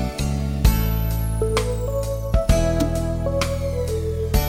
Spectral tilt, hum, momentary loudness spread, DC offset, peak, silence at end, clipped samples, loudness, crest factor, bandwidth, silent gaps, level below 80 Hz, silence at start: -6 dB/octave; none; 5 LU; under 0.1%; -2 dBFS; 0 s; under 0.1%; -22 LUFS; 18 dB; 16.5 kHz; none; -24 dBFS; 0 s